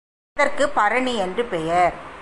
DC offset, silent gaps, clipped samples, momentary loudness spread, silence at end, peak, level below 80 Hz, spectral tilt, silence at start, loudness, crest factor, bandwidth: under 0.1%; none; under 0.1%; 5 LU; 0 s; -6 dBFS; -48 dBFS; -4 dB/octave; 0.35 s; -21 LUFS; 16 dB; 11.5 kHz